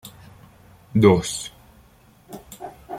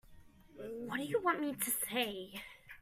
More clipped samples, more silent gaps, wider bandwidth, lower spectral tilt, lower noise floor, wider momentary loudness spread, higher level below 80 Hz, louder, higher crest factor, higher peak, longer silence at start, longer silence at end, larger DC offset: neither; neither; about the same, 16 kHz vs 16 kHz; first, -6 dB/octave vs -2.5 dB/octave; second, -53 dBFS vs -59 dBFS; first, 26 LU vs 15 LU; first, -52 dBFS vs -68 dBFS; first, -19 LUFS vs -37 LUFS; about the same, 22 dB vs 20 dB; first, -2 dBFS vs -20 dBFS; about the same, 0.05 s vs 0.05 s; about the same, 0 s vs 0 s; neither